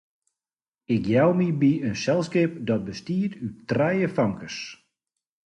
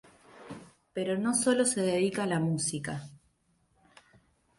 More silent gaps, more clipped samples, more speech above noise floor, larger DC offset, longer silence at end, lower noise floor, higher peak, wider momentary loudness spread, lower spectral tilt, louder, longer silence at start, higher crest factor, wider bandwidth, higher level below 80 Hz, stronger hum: neither; neither; first, over 66 dB vs 42 dB; neither; second, 0.7 s vs 1.4 s; first, under -90 dBFS vs -71 dBFS; first, -8 dBFS vs -14 dBFS; second, 13 LU vs 21 LU; first, -7 dB/octave vs -4.5 dB/octave; first, -24 LUFS vs -29 LUFS; first, 0.9 s vs 0.35 s; about the same, 16 dB vs 18 dB; second, 9.4 kHz vs 12 kHz; first, -58 dBFS vs -68 dBFS; neither